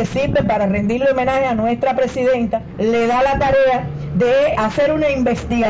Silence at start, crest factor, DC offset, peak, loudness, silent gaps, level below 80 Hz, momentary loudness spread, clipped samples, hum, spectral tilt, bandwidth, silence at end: 0 s; 8 dB; under 0.1%; -8 dBFS; -17 LUFS; none; -36 dBFS; 4 LU; under 0.1%; none; -6.5 dB/octave; 7.8 kHz; 0 s